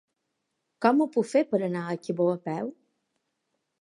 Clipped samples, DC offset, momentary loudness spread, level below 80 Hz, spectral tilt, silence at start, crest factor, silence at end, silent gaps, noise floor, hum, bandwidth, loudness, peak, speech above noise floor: under 0.1%; under 0.1%; 10 LU; -82 dBFS; -7 dB/octave; 0.8 s; 22 dB; 1.1 s; none; -80 dBFS; none; 11.5 kHz; -27 LUFS; -6 dBFS; 55 dB